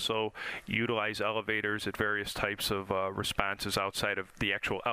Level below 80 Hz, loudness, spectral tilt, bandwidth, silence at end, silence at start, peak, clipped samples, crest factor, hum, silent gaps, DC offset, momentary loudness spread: -54 dBFS; -32 LUFS; -3.5 dB/octave; 15.5 kHz; 0 s; 0 s; -8 dBFS; under 0.1%; 26 dB; none; none; under 0.1%; 3 LU